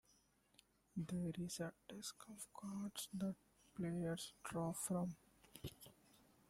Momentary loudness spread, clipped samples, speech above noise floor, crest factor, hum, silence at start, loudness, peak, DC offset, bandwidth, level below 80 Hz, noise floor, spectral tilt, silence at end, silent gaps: 14 LU; under 0.1%; 30 dB; 16 dB; none; 0.95 s; -48 LUFS; -32 dBFS; under 0.1%; 16 kHz; -74 dBFS; -77 dBFS; -5 dB/octave; 0.25 s; none